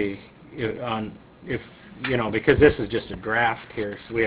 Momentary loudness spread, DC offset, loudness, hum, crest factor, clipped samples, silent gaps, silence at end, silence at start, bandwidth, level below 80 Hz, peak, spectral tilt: 19 LU; under 0.1%; -24 LUFS; none; 22 dB; under 0.1%; none; 0 s; 0 s; 4 kHz; -42 dBFS; -2 dBFS; -10 dB/octave